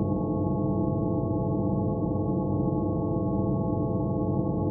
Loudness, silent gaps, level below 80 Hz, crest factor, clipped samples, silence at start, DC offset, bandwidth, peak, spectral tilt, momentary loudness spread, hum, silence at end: -27 LUFS; none; -42 dBFS; 12 dB; under 0.1%; 0 s; under 0.1%; 1.2 kHz; -14 dBFS; -6.5 dB/octave; 1 LU; none; 0 s